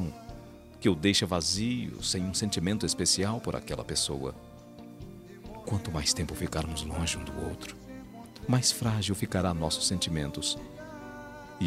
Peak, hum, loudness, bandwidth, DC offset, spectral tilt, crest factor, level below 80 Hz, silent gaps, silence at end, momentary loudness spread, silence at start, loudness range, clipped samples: -10 dBFS; none; -30 LUFS; 16 kHz; under 0.1%; -4 dB/octave; 22 dB; -50 dBFS; none; 0 s; 21 LU; 0 s; 5 LU; under 0.1%